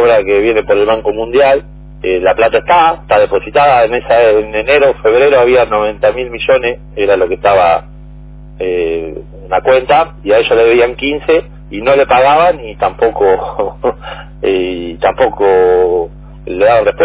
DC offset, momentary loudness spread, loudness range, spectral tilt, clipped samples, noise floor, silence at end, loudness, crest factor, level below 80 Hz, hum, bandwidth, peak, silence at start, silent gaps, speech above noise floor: under 0.1%; 10 LU; 4 LU; -9 dB/octave; under 0.1%; -31 dBFS; 0 s; -11 LUFS; 10 dB; -34 dBFS; none; 4 kHz; 0 dBFS; 0 s; none; 21 dB